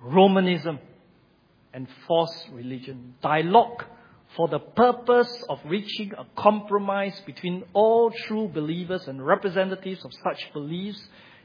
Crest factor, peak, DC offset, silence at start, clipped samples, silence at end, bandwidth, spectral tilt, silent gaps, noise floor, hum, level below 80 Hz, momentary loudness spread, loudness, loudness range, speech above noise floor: 22 dB; -2 dBFS; under 0.1%; 0 s; under 0.1%; 0.4 s; 5.2 kHz; -8 dB/octave; none; -60 dBFS; none; -70 dBFS; 18 LU; -24 LUFS; 3 LU; 36 dB